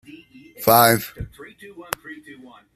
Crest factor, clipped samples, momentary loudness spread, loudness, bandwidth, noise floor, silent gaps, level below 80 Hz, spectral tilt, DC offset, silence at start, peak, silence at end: 22 dB; under 0.1%; 26 LU; -18 LUFS; 15 kHz; -45 dBFS; none; -50 dBFS; -3.5 dB/octave; under 0.1%; 0.6 s; 0 dBFS; 0.6 s